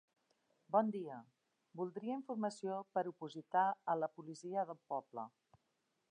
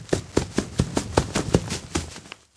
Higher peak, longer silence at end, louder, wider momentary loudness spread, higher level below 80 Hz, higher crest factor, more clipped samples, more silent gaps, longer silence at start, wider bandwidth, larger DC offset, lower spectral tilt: second, -22 dBFS vs 0 dBFS; first, 0.8 s vs 0.2 s; second, -41 LUFS vs -26 LUFS; first, 14 LU vs 7 LU; second, under -90 dBFS vs -38 dBFS; second, 20 dB vs 26 dB; neither; neither; first, 0.7 s vs 0 s; about the same, 10 kHz vs 11 kHz; neither; first, -6.5 dB/octave vs -5 dB/octave